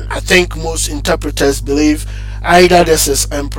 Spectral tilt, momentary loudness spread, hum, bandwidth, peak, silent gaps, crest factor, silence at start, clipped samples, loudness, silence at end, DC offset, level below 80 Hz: -3.5 dB/octave; 10 LU; 50 Hz at -20 dBFS; 17 kHz; 0 dBFS; none; 12 dB; 0 s; under 0.1%; -12 LUFS; 0 s; under 0.1%; -22 dBFS